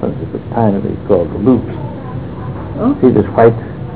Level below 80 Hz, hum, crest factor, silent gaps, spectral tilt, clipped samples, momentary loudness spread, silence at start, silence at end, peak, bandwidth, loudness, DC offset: -34 dBFS; none; 14 dB; none; -13 dB/octave; under 0.1%; 14 LU; 0 s; 0 s; 0 dBFS; 4 kHz; -14 LUFS; 1%